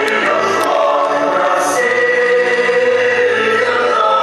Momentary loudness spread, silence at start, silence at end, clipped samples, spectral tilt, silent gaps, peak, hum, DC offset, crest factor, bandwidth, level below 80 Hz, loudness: 2 LU; 0 s; 0 s; under 0.1%; -2.5 dB/octave; none; 0 dBFS; none; under 0.1%; 12 dB; 13 kHz; -64 dBFS; -13 LUFS